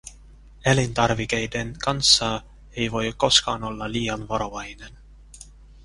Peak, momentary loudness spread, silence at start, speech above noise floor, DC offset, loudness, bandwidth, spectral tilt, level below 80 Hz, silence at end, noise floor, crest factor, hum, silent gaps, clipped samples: -2 dBFS; 15 LU; 0.05 s; 24 dB; under 0.1%; -22 LUFS; 11.5 kHz; -3 dB/octave; -44 dBFS; 0.05 s; -47 dBFS; 24 dB; none; none; under 0.1%